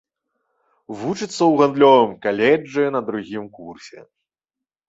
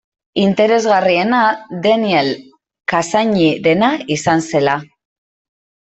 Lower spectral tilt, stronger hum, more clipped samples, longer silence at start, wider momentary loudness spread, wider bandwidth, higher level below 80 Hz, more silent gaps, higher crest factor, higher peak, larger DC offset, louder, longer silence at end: about the same, -5.5 dB/octave vs -5 dB/octave; neither; neither; first, 0.9 s vs 0.35 s; first, 23 LU vs 7 LU; about the same, 8 kHz vs 8.4 kHz; second, -64 dBFS vs -56 dBFS; neither; about the same, 18 dB vs 14 dB; about the same, -2 dBFS vs -2 dBFS; neither; second, -18 LUFS vs -15 LUFS; about the same, 0.9 s vs 1 s